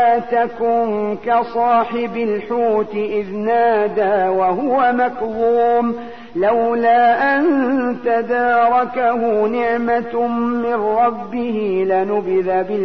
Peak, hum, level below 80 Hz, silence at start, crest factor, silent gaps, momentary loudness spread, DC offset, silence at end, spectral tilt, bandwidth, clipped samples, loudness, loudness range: -4 dBFS; none; -54 dBFS; 0 s; 12 dB; none; 6 LU; 0.9%; 0 s; -8 dB/octave; 6 kHz; under 0.1%; -17 LUFS; 3 LU